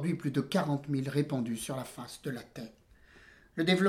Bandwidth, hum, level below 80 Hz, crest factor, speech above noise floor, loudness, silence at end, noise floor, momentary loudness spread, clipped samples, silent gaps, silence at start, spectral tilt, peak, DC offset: 15.5 kHz; none; -66 dBFS; 20 dB; 27 dB; -34 LUFS; 0 s; -59 dBFS; 13 LU; under 0.1%; none; 0 s; -6 dB/octave; -14 dBFS; under 0.1%